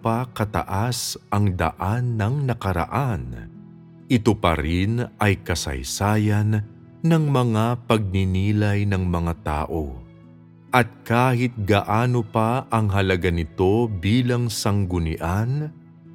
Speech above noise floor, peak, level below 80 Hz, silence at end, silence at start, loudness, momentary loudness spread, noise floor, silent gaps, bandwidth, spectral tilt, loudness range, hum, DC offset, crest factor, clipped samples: 26 dB; 0 dBFS; -40 dBFS; 0 s; 0 s; -22 LUFS; 6 LU; -47 dBFS; none; 16.5 kHz; -6 dB/octave; 3 LU; none; under 0.1%; 22 dB; under 0.1%